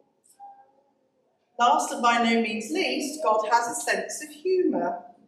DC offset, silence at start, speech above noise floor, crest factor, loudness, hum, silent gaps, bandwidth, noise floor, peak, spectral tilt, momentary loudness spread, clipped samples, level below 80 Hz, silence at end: under 0.1%; 0.4 s; 45 dB; 18 dB; -25 LUFS; none; none; 14.5 kHz; -70 dBFS; -10 dBFS; -2.5 dB/octave; 8 LU; under 0.1%; -82 dBFS; 0.2 s